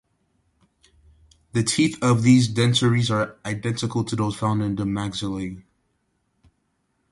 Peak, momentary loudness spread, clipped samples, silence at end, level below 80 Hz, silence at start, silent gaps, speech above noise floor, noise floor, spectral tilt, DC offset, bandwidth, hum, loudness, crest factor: -4 dBFS; 11 LU; under 0.1%; 1.5 s; -52 dBFS; 1.55 s; none; 50 dB; -71 dBFS; -5.5 dB/octave; under 0.1%; 11.5 kHz; none; -22 LUFS; 18 dB